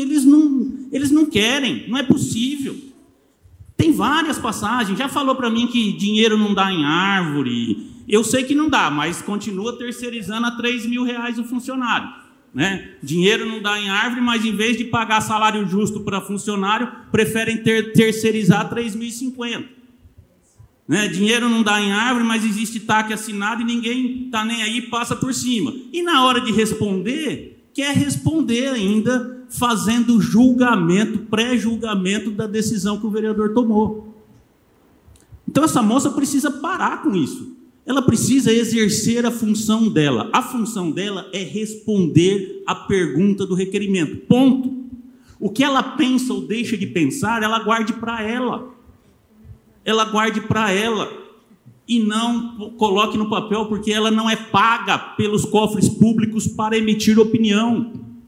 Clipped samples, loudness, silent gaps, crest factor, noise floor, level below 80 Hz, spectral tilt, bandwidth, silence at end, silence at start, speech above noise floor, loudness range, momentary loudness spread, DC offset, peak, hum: under 0.1%; -19 LUFS; none; 18 dB; -55 dBFS; -54 dBFS; -4.5 dB/octave; 16.5 kHz; 0.1 s; 0 s; 37 dB; 4 LU; 10 LU; under 0.1%; 0 dBFS; none